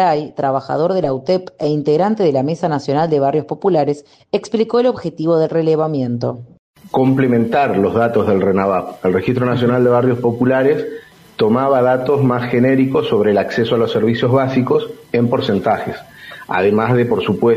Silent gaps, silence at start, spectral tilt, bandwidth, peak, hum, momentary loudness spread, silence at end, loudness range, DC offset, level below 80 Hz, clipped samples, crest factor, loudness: 6.59-6.74 s; 0 s; -8 dB/octave; 14 kHz; -4 dBFS; none; 7 LU; 0 s; 2 LU; under 0.1%; -56 dBFS; under 0.1%; 12 dB; -16 LUFS